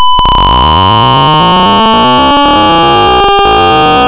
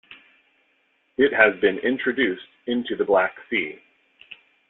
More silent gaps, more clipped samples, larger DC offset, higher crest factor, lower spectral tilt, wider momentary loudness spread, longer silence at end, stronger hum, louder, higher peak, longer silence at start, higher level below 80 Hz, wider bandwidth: neither; neither; neither; second, 6 dB vs 20 dB; about the same, -9 dB/octave vs -8.5 dB/octave; second, 0 LU vs 12 LU; second, 0 s vs 0.35 s; neither; first, -5 LUFS vs -22 LUFS; first, 0 dBFS vs -4 dBFS; about the same, 0 s vs 0.1 s; first, -20 dBFS vs -64 dBFS; about the same, 4 kHz vs 4.1 kHz